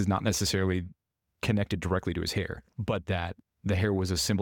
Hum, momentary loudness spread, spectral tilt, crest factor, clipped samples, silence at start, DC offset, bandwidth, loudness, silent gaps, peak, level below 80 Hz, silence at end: none; 10 LU; -5 dB/octave; 16 dB; under 0.1%; 0 s; under 0.1%; 17.5 kHz; -30 LUFS; none; -14 dBFS; -48 dBFS; 0 s